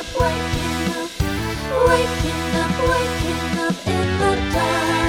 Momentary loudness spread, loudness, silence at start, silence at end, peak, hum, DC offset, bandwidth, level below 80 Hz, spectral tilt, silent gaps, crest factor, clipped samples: 6 LU; -20 LUFS; 0 s; 0 s; -4 dBFS; none; under 0.1%; 19.5 kHz; -32 dBFS; -5 dB/octave; none; 16 dB; under 0.1%